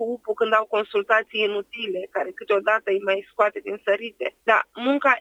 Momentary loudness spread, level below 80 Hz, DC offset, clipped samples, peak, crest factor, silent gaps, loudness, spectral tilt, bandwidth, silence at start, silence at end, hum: 8 LU; -72 dBFS; under 0.1%; under 0.1%; -4 dBFS; 20 dB; none; -23 LUFS; -4.5 dB/octave; 9.6 kHz; 0 s; 0 s; none